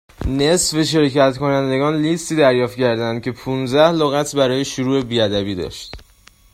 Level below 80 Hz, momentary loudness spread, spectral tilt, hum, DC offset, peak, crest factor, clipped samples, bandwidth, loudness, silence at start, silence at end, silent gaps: -40 dBFS; 9 LU; -4.5 dB/octave; none; under 0.1%; 0 dBFS; 18 dB; under 0.1%; 15.5 kHz; -17 LUFS; 0.2 s; 0.55 s; none